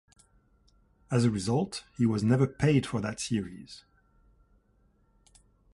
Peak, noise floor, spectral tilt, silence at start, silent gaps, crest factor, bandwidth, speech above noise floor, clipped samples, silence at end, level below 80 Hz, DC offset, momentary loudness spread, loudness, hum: -12 dBFS; -67 dBFS; -6.5 dB/octave; 1.1 s; none; 20 dB; 11.5 kHz; 39 dB; under 0.1%; 2 s; -56 dBFS; under 0.1%; 17 LU; -28 LUFS; none